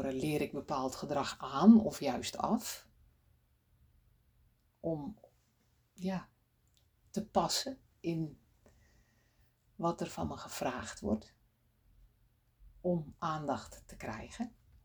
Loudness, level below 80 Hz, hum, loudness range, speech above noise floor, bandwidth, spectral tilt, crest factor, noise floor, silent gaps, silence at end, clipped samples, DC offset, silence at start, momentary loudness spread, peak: -35 LUFS; -62 dBFS; none; 13 LU; 39 dB; over 20 kHz; -5.5 dB/octave; 26 dB; -73 dBFS; none; 0.35 s; under 0.1%; under 0.1%; 0 s; 14 LU; -12 dBFS